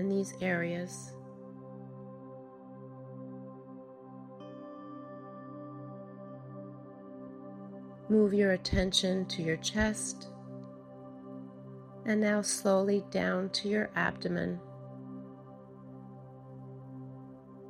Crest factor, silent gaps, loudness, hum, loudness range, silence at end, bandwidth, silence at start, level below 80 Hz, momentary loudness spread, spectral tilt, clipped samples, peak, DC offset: 22 dB; none; -31 LUFS; none; 17 LU; 0 s; 14 kHz; 0 s; -54 dBFS; 21 LU; -4.5 dB/octave; under 0.1%; -14 dBFS; under 0.1%